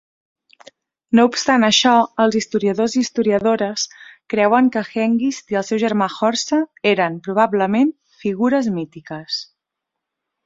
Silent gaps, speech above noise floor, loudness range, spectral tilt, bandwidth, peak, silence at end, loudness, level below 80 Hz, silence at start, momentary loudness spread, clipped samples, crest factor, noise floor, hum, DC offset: none; 64 dB; 3 LU; -4 dB/octave; 7.8 kHz; -2 dBFS; 1.05 s; -18 LUFS; -62 dBFS; 1.1 s; 11 LU; under 0.1%; 16 dB; -82 dBFS; none; under 0.1%